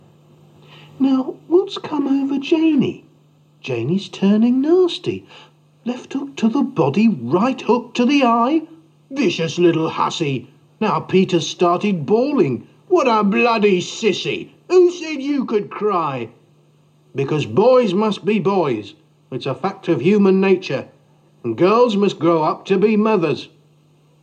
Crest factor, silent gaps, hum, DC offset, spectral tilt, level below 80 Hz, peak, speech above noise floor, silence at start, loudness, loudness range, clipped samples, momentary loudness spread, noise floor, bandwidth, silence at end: 14 dB; none; none; under 0.1%; -6.5 dB/octave; -72 dBFS; -4 dBFS; 37 dB; 1 s; -18 LUFS; 3 LU; under 0.1%; 12 LU; -54 dBFS; 9 kHz; 0.75 s